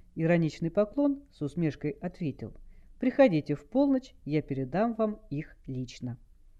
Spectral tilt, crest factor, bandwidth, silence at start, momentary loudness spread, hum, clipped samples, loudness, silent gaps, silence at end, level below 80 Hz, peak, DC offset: -8.5 dB/octave; 20 dB; 7.8 kHz; 0.15 s; 15 LU; none; under 0.1%; -30 LUFS; none; 0.45 s; -54 dBFS; -10 dBFS; under 0.1%